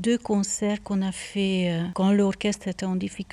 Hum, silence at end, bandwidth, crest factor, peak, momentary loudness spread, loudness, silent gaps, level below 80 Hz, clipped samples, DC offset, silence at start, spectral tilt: none; 0.1 s; 12 kHz; 12 dB; -12 dBFS; 7 LU; -25 LUFS; none; -54 dBFS; under 0.1%; under 0.1%; 0 s; -5.5 dB/octave